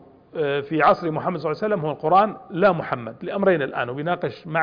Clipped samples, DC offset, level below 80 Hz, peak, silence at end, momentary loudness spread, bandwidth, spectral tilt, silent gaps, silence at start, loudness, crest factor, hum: under 0.1%; under 0.1%; -60 dBFS; -6 dBFS; 0 s; 9 LU; 5.2 kHz; -8.5 dB/octave; none; 0.35 s; -22 LUFS; 16 dB; none